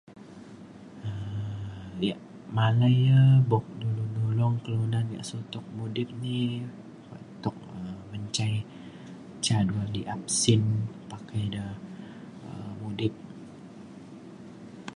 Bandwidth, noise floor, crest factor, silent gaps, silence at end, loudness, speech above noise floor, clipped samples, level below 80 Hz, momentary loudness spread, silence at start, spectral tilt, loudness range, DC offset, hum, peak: 11 kHz; -46 dBFS; 18 dB; none; 0 s; -28 LUFS; 21 dB; under 0.1%; -56 dBFS; 23 LU; 0.1 s; -5.5 dB/octave; 11 LU; under 0.1%; none; -10 dBFS